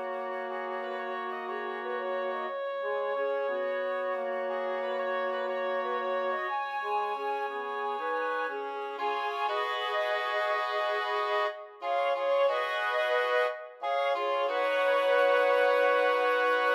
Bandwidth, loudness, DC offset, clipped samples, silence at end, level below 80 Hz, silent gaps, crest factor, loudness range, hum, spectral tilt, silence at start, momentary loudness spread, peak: 12.5 kHz; -30 LUFS; under 0.1%; under 0.1%; 0 s; under -90 dBFS; none; 16 dB; 6 LU; none; -2 dB/octave; 0 s; 10 LU; -14 dBFS